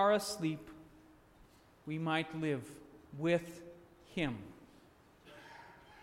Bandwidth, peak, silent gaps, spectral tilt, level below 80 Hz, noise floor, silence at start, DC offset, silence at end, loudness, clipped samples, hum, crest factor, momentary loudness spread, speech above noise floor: 16.5 kHz; -18 dBFS; none; -5.5 dB/octave; -66 dBFS; -63 dBFS; 0 s; under 0.1%; 0 s; -37 LUFS; under 0.1%; none; 20 dB; 23 LU; 27 dB